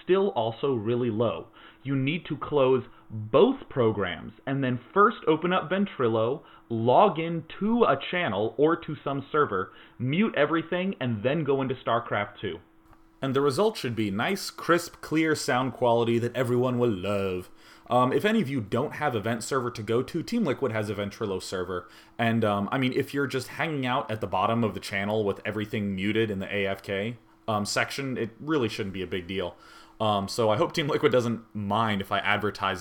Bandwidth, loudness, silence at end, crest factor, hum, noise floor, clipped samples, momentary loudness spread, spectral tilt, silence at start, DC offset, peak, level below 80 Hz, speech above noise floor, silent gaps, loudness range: 18.5 kHz; -27 LUFS; 0 s; 20 dB; none; -56 dBFS; under 0.1%; 9 LU; -6 dB/octave; 0.05 s; under 0.1%; -6 dBFS; -60 dBFS; 29 dB; none; 4 LU